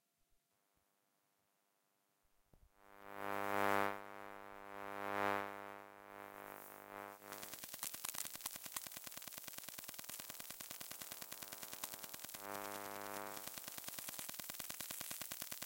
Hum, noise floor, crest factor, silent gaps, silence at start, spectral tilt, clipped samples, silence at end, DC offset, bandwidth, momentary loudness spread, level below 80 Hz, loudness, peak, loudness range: none; -82 dBFS; 28 dB; none; 2.55 s; -1.5 dB/octave; under 0.1%; 0 s; under 0.1%; 17 kHz; 14 LU; -80 dBFS; -46 LUFS; -20 dBFS; 5 LU